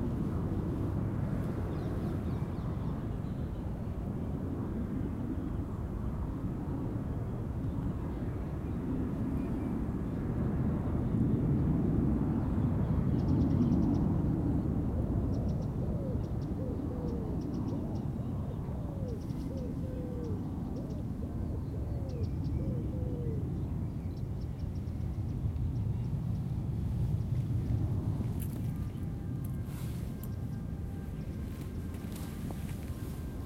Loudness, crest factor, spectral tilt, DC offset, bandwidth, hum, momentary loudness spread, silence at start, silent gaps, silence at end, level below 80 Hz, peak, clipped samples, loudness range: -35 LUFS; 16 dB; -9.5 dB/octave; under 0.1%; 16 kHz; none; 8 LU; 0 s; none; 0 s; -42 dBFS; -18 dBFS; under 0.1%; 7 LU